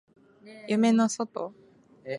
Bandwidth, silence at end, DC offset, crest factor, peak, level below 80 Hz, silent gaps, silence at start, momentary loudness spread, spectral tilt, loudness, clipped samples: 11.5 kHz; 0 s; under 0.1%; 16 dB; -12 dBFS; -80 dBFS; none; 0.45 s; 22 LU; -5 dB/octave; -26 LUFS; under 0.1%